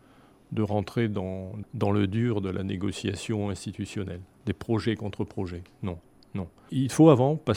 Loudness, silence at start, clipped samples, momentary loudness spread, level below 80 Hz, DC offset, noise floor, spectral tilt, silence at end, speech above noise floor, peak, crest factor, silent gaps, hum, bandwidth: -28 LUFS; 0.5 s; under 0.1%; 16 LU; -56 dBFS; under 0.1%; -56 dBFS; -7 dB/octave; 0 s; 30 dB; -4 dBFS; 24 dB; none; none; 14.5 kHz